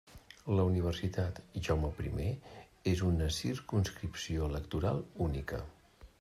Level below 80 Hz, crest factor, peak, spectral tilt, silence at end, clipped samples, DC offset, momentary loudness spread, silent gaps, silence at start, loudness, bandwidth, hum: -46 dBFS; 18 dB; -18 dBFS; -6.5 dB/octave; 0.15 s; under 0.1%; under 0.1%; 11 LU; none; 0.1 s; -35 LUFS; 14 kHz; none